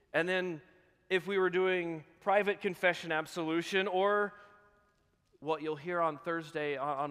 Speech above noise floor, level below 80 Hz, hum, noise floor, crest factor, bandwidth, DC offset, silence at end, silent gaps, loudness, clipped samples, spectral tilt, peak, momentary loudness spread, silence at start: 40 dB; -78 dBFS; none; -73 dBFS; 20 dB; 14.5 kHz; under 0.1%; 0 s; none; -33 LUFS; under 0.1%; -5 dB/octave; -14 dBFS; 8 LU; 0.15 s